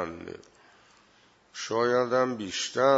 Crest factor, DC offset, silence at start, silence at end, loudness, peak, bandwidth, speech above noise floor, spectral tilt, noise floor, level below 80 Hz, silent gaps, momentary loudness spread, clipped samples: 20 dB; under 0.1%; 0 s; 0 s; -28 LUFS; -8 dBFS; 8 kHz; 36 dB; -3.5 dB/octave; -61 dBFS; -68 dBFS; none; 20 LU; under 0.1%